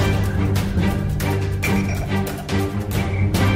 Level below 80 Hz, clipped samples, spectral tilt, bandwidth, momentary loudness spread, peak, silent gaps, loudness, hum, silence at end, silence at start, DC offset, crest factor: -30 dBFS; under 0.1%; -6 dB/octave; 16 kHz; 3 LU; -6 dBFS; none; -21 LUFS; none; 0 s; 0 s; under 0.1%; 12 dB